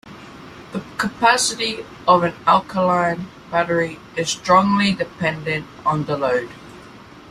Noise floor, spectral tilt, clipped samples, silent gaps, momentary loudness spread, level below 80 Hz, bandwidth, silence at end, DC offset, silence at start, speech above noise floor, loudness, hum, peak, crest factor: -41 dBFS; -4 dB/octave; under 0.1%; none; 16 LU; -54 dBFS; 15 kHz; 0 s; under 0.1%; 0.05 s; 22 dB; -19 LUFS; none; -2 dBFS; 20 dB